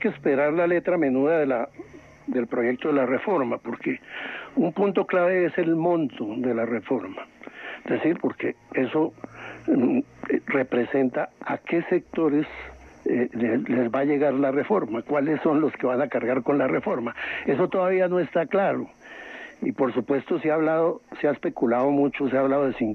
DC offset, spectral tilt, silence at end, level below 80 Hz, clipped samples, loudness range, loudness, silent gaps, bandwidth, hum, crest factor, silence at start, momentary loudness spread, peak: under 0.1%; -8.5 dB/octave; 0 s; -62 dBFS; under 0.1%; 3 LU; -24 LUFS; none; 6.4 kHz; none; 14 dB; 0 s; 11 LU; -10 dBFS